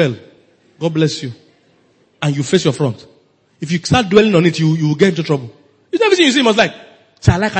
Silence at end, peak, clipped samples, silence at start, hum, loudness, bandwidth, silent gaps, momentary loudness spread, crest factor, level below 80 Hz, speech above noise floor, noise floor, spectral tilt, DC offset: 0 s; 0 dBFS; under 0.1%; 0 s; none; -15 LUFS; 8.8 kHz; none; 13 LU; 16 dB; -40 dBFS; 41 dB; -54 dBFS; -5.5 dB/octave; under 0.1%